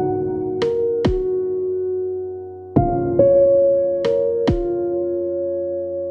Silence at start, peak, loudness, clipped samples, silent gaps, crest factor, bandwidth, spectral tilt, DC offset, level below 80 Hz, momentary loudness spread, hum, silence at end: 0 s; 0 dBFS; -19 LUFS; under 0.1%; none; 18 dB; 6.8 kHz; -9 dB/octave; under 0.1%; -36 dBFS; 10 LU; none; 0 s